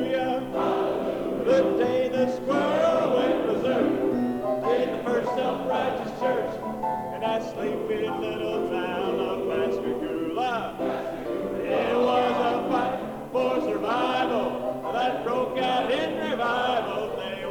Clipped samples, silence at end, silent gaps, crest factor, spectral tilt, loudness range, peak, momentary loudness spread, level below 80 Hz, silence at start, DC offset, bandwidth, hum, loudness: under 0.1%; 0 s; none; 16 dB; -6 dB/octave; 4 LU; -10 dBFS; 7 LU; -56 dBFS; 0 s; under 0.1%; 19 kHz; none; -26 LUFS